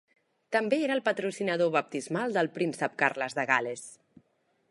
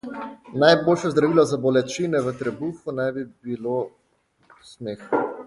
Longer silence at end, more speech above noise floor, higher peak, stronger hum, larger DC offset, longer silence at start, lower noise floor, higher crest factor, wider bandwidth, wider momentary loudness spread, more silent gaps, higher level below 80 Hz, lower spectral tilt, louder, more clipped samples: first, 0.75 s vs 0 s; about the same, 43 dB vs 43 dB; second, -8 dBFS vs -2 dBFS; neither; neither; first, 0.5 s vs 0.05 s; first, -72 dBFS vs -65 dBFS; about the same, 22 dB vs 20 dB; about the same, 11.5 kHz vs 11.5 kHz; second, 6 LU vs 17 LU; neither; second, -80 dBFS vs -62 dBFS; about the same, -4.5 dB/octave vs -5.5 dB/octave; second, -29 LUFS vs -22 LUFS; neither